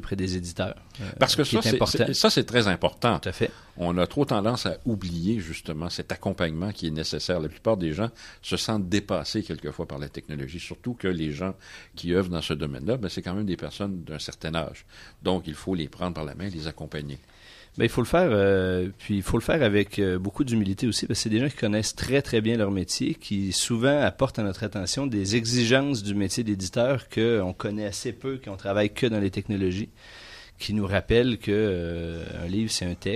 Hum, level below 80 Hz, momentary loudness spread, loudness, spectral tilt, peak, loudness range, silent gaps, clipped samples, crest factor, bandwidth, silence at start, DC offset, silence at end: none; -46 dBFS; 12 LU; -26 LUFS; -5 dB/octave; -4 dBFS; 7 LU; none; under 0.1%; 24 dB; 14.5 kHz; 0 s; under 0.1%; 0 s